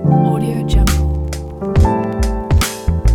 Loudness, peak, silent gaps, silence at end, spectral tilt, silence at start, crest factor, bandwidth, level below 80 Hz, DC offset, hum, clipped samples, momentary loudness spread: -16 LUFS; -2 dBFS; none; 0 s; -6 dB/octave; 0 s; 12 dB; 18 kHz; -18 dBFS; under 0.1%; none; under 0.1%; 6 LU